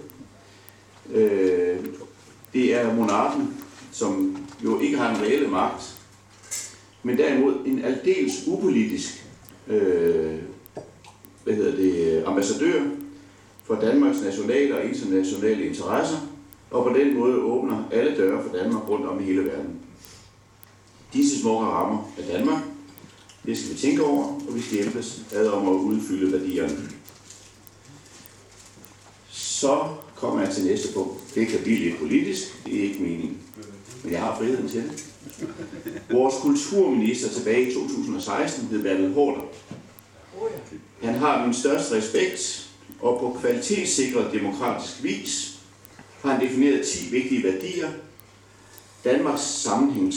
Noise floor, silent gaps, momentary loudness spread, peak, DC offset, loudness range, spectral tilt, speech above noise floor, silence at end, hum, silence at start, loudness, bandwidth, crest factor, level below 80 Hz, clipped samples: -52 dBFS; none; 16 LU; -8 dBFS; under 0.1%; 4 LU; -4.5 dB/octave; 29 dB; 0 s; none; 0 s; -24 LUFS; 18 kHz; 16 dB; -62 dBFS; under 0.1%